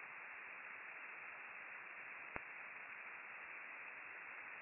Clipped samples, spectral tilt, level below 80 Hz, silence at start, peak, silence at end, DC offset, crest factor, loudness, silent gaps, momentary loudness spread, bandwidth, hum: under 0.1%; 3.5 dB/octave; -82 dBFS; 0 s; -22 dBFS; 0 s; under 0.1%; 30 dB; -51 LUFS; none; 2 LU; 2.9 kHz; none